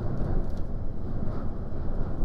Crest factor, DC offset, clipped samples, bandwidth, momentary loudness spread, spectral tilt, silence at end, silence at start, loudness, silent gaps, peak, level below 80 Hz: 12 dB; under 0.1%; under 0.1%; 2.1 kHz; 5 LU; -10 dB/octave; 0 s; 0 s; -34 LUFS; none; -14 dBFS; -30 dBFS